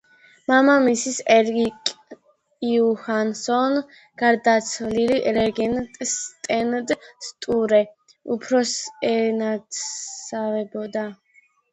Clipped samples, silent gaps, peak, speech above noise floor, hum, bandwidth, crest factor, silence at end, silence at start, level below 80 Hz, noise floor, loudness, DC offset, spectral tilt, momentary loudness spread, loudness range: under 0.1%; none; -2 dBFS; 27 dB; none; 9 kHz; 20 dB; 0.6 s; 0.5 s; -58 dBFS; -48 dBFS; -22 LUFS; under 0.1%; -3.5 dB/octave; 12 LU; 4 LU